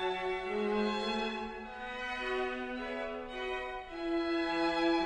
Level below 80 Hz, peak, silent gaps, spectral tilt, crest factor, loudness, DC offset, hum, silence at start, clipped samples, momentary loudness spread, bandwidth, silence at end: -56 dBFS; -20 dBFS; none; -5 dB/octave; 16 dB; -35 LUFS; under 0.1%; none; 0 s; under 0.1%; 8 LU; 9.8 kHz; 0 s